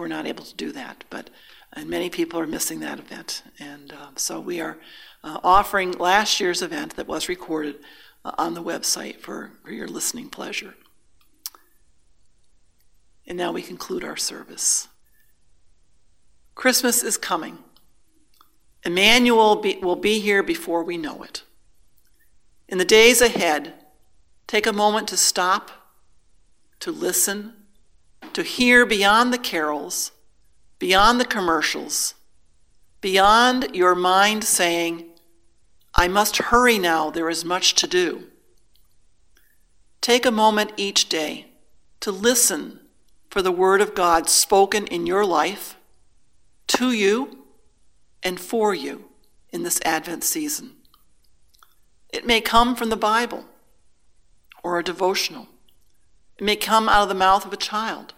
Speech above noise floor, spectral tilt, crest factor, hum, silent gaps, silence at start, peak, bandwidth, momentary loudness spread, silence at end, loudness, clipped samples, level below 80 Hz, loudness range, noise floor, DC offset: 41 dB; -2 dB/octave; 22 dB; none; none; 0 s; 0 dBFS; 16 kHz; 19 LU; 0.1 s; -20 LUFS; under 0.1%; -46 dBFS; 10 LU; -62 dBFS; 0.1%